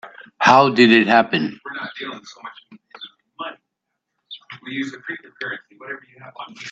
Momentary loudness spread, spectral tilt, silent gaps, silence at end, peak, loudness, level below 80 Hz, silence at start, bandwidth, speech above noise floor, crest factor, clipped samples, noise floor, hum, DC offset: 26 LU; -5 dB/octave; none; 0 s; 0 dBFS; -17 LUFS; -66 dBFS; 0.05 s; 8 kHz; 60 dB; 20 dB; under 0.1%; -79 dBFS; none; under 0.1%